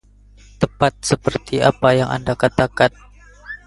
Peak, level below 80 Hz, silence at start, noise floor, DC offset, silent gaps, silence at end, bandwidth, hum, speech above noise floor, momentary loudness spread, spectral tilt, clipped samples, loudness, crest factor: 0 dBFS; -42 dBFS; 0.6 s; -47 dBFS; under 0.1%; none; 0.1 s; 11.5 kHz; 50 Hz at -40 dBFS; 29 dB; 7 LU; -5 dB/octave; under 0.1%; -18 LUFS; 18 dB